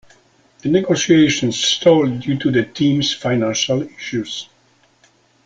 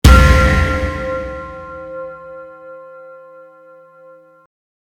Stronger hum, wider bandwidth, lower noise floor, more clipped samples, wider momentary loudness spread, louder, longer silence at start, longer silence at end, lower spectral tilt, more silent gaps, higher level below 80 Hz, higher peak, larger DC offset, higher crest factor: neither; second, 9.2 kHz vs 17 kHz; first, -56 dBFS vs -44 dBFS; second, under 0.1% vs 0.2%; second, 12 LU vs 27 LU; second, -17 LUFS vs -14 LUFS; first, 0.65 s vs 0.05 s; second, 1 s vs 2 s; about the same, -4.5 dB/octave vs -5.5 dB/octave; neither; second, -54 dBFS vs -20 dBFS; about the same, -2 dBFS vs 0 dBFS; neither; about the same, 16 dB vs 16 dB